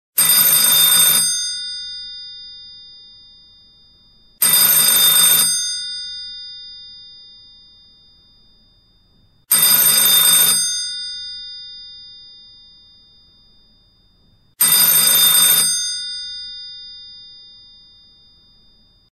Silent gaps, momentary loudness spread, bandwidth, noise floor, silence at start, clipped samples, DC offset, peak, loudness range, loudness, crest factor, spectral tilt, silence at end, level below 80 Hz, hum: none; 24 LU; 16 kHz; -55 dBFS; 0.15 s; under 0.1%; under 0.1%; -2 dBFS; 15 LU; -11 LUFS; 18 dB; 1.5 dB/octave; 1.85 s; -56 dBFS; none